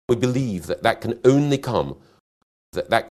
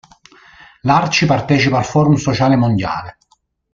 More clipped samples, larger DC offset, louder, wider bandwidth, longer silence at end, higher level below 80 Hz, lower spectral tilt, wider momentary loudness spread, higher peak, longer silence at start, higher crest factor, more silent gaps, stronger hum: neither; neither; second, -21 LUFS vs -15 LUFS; first, 13.5 kHz vs 7.6 kHz; second, 0.1 s vs 0.6 s; second, -50 dBFS vs -44 dBFS; about the same, -6.5 dB/octave vs -6 dB/octave; first, 13 LU vs 10 LU; about the same, -2 dBFS vs -2 dBFS; second, 0.1 s vs 0.85 s; first, 20 dB vs 14 dB; first, 2.20-2.73 s vs none; neither